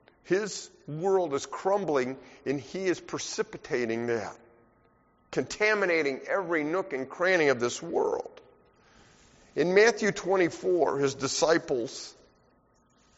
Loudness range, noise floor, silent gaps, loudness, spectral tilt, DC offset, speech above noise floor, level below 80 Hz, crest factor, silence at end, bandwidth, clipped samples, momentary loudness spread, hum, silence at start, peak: 5 LU; -65 dBFS; none; -28 LUFS; -3.5 dB/octave; under 0.1%; 37 dB; -66 dBFS; 20 dB; 1.05 s; 8 kHz; under 0.1%; 12 LU; none; 0.25 s; -8 dBFS